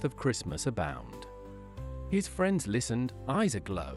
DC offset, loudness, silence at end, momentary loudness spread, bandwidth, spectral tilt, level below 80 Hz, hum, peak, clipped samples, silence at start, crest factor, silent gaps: under 0.1%; -32 LUFS; 0 s; 17 LU; 13.5 kHz; -5.5 dB/octave; -48 dBFS; none; -16 dBFS; under 0.1%; 0 s; 16 dB; none